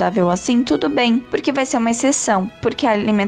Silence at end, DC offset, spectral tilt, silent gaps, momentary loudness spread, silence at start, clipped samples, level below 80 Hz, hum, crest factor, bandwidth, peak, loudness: 0 s; under 0.1%; -4 dB/octave; none; 3 LU; 0 s; under 0.1%; -50 dBFS; none; 12 dB; 10 kHz; -6 dBFS; -17 LUFS